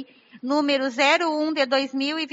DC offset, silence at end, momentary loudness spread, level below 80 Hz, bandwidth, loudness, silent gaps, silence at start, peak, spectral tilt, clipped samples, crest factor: under 0.1%; 0.05 s; 7 LU; -84 dBFS; 8 kHz; -22 LUFS; none; 0 s; -6 dBFS; 1 dB/octave; under 0.1%; 18 dB